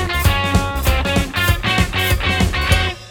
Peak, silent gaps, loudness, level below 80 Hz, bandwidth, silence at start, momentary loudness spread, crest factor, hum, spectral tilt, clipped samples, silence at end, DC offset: 0 dBFS; none; -17 LUFS; -22 dBFS; 19.5 kHz; 0 s; 2 LU; 16 dB; none; -4.5 dB/octave; under 0.1%; 0 s; under 0.1%